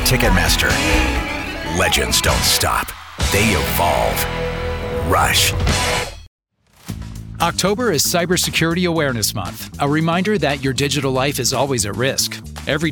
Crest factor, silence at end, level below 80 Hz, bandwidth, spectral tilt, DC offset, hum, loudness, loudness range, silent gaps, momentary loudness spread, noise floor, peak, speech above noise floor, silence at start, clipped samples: 18 dB; 0 s; -28 dBFS; over 20 kHz; -3.5 dB/octave; under 0.1%; none; -17 LUFS; 3 LU; 6.27-6.39 s; 9 LU; -46 dBFS; 0 dBFS; 29 dB; 0 s; under 0.1%